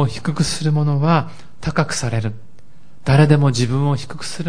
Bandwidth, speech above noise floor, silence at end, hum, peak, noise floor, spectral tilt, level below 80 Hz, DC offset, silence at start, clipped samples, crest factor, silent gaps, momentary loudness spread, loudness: 10.5 kHz; 33 dB; 0 s; none; -2 dBFS; -50 dBFS; -6 dB/octave; -42 dBFS; 3%; 0 s; under 0.1%; 16 dB; none; 14 LU; -18 LUFS